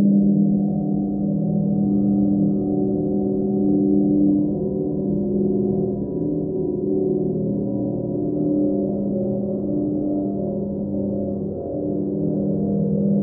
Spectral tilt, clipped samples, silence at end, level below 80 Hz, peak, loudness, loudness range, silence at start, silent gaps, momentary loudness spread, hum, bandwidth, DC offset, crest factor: -17 dB/octave; under 0.1%; 0 s; -46 dBFS; -8 dBFS; -21 LUFS; 4 LU; 0 s; none; 6 LU; none; 1.3 kHz; under 0.1%; 12 dB